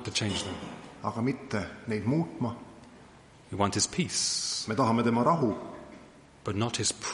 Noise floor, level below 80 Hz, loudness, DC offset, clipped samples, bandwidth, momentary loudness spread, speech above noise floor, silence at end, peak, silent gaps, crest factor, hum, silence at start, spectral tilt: -54 dBFS; -60 dBFS; -29 LUFS; under 0.1%; under 0.1%; 11.5 kHz; 17 LU; 24 dB; 0 s; -10 dBFS; none; 20 dB; none; 0 s; -4 dB/octave